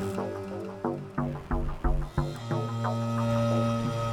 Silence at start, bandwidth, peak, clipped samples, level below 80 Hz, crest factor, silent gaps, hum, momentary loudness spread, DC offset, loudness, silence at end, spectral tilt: 0 s; 13.5 kHz; -12 dBFS; under 0.1%; -36 dBFS; 16 dB; none; none; 7 LU; under 0.1%; -31 LUFS; 0 s; -7.5 dB/octave